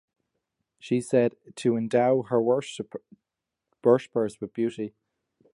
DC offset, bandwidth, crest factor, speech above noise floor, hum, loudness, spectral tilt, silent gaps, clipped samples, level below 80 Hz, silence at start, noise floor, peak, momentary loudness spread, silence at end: under 0.1%; 11.5 kHz; 20 dB; 61 dB; none; -26 LUFS; -6.5 dB/octave; none; under 0.1%; -72 dBFS; 0.85 s; -86 dBFS; -8 dBFS; 14 LU; 0.65 s